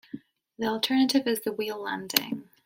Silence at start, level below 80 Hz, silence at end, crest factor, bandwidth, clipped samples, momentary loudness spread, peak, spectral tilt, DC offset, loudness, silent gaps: 0.15 s; -70 dBFS; 0.25 s; 28 dB; 16.5 kHz; under 0.1%; 13 LU; 0 dBFS; -3 dB/octave; under 0.1%; -27 LUFS; none